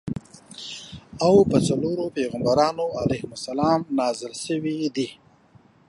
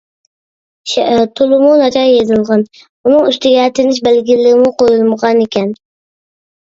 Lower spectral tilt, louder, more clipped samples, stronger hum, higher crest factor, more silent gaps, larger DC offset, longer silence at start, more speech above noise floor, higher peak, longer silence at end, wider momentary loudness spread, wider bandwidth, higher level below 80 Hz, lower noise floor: about the same, -6 dB/octave vs -5 dB/octave; second, -23 LUFS vs -10 LUFS; neither; neither; first, 20 dB vs 12 dB; second, none vs 2.89-3.04 s; neither; second, 0.05 s vs 0.85 s; second, 32 dB vs over 80 dB; second, -4 dBFS vs 0 dBFS; second, 0.75 s vs 0.9 s; first, 17 LU vs 9 LU; first, 11.5 kHz vs 7.8 kHz; about the same, -52 dBFS vs -52 dBFS; second, -55 dBFS vs under -90 dBFS